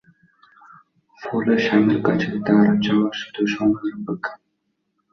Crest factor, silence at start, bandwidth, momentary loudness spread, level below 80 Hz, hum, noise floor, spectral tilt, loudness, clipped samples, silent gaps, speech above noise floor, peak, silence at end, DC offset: 18 dB; 1.2 s; 6.4 kHz; 12 LU; -60 dBFS; none; -73 dBFS; -7 dB/octave; -20 LUFS; under 0.1%; none; 53 dB; -4 dBFS; 0.8 s; under 0.1%